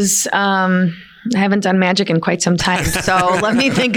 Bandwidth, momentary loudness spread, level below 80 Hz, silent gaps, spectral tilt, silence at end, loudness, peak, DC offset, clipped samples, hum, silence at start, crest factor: 18 kHz; 3 LU; -40 dBFS; none; -4 dB/octave; 0 s; -15 LUFS; -4 dBFS; under 0.1%; under 0.1%; none; 0 s; 12 dB